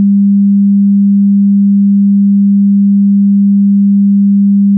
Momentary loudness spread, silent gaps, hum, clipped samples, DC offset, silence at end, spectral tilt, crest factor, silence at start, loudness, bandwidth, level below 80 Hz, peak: 0 LU; none; none; under 0.1%; under 0.1%; 0 s; -18 dB/octave; 4 dB; 0 s; -8 LUFS; 0.3 kHz; -74 dBFS; -4 dBFS